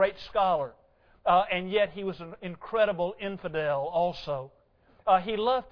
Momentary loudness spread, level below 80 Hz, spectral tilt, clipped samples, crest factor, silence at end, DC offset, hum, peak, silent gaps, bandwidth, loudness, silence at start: 12 LU; -58 dBFS; -7 dB/octave; under 0.1%; 18 dB; 0 s; under 0.1%; none; -10 dBFS; none; 5.4 kHz; -28 LUFS; 0 s